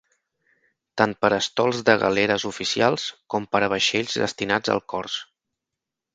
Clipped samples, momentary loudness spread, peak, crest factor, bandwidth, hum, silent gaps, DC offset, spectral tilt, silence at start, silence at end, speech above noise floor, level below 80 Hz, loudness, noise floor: under 0.1%; 9 LU; 0 dBFS; 24 dB; 9.4 kHz; none; none; under 0.1%; -3.5 dB/octave; 0.95 s; 0.9 s; 63 dB; -60 dBFS; -22 LUFS; -86 dBFS